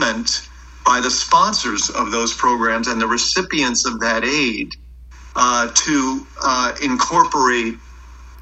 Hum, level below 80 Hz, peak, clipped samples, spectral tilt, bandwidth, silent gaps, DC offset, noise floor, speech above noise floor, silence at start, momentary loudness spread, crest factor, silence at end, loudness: none; -42 dBFS; 0 dBFS; under 0.1%; -1.5 dB/octave; 8.6 kHz; none; under 0.1%; -39 dBFS; 21 dB; 0 s; 8 LU; 18 dB; 0 s; -17 LUFS